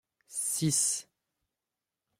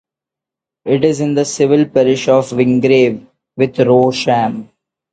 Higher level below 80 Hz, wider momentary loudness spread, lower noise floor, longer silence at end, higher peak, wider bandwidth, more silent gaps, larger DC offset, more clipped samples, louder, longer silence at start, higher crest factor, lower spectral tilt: second, -72 dBFS vs -54 dBFS; about the same, 10 LU vs 9 LU; first, -89 dBFS vs -85 dBFS; first, 1.15 s vs 0.5 s; second, -16 dBFS vs 0 dBFS; first, 16 kHz vs 9.2 kHz; neither; neither; neither; second, -29 LUFS vs -13 LUFS; second, 0.3 s vs 0.85 s; about the same, 18 dB vs 14 dB; second, -3 dB/octave vs -6 dB/octave